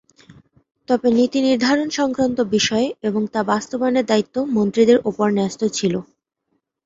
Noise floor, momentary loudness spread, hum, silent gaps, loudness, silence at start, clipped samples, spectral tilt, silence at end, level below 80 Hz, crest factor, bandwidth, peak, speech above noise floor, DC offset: -72 dBFS; 6 LU; none; none; -19 LUFS; 0.9 s; under 0.1%; -4.5 dB/octave; 0.85 s; -58 dBFS; 16 dB; 7.8 kHz; -2 dBFS; 54 dB; under 0.1%